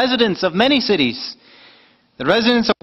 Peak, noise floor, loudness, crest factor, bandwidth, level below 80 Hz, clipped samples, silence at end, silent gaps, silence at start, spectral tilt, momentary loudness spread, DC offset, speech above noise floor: 0 dBFS; -51 dBFS; -16 LUFS; 18 dB; 7 kHz; -52 dBFS; under 0.1%; 0.1 s; none; 0 s; -5.5 dB/octave; 11 LU; under 0.1%; 34 dB